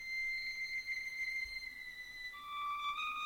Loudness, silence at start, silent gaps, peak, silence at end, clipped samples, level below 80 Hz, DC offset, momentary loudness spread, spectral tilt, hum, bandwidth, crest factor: -40 LUFS; 0 s; none; -30 dBFS; 0 s; under 0.1%; -66 dBFS; under 0.1%; 8 LU; 1 dB/octave; none; 17 kHz; 12 dB